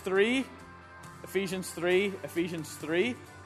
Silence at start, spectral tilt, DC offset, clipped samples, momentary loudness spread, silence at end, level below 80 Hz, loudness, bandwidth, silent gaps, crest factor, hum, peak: 0 s; -4.5 dB/octave; under 0.1%; under 0.1%; 21 LU; 0 s; -68 dBFS; -31 LUFS; 13.5 kHz; none; 20 dB; none; -12 dBFS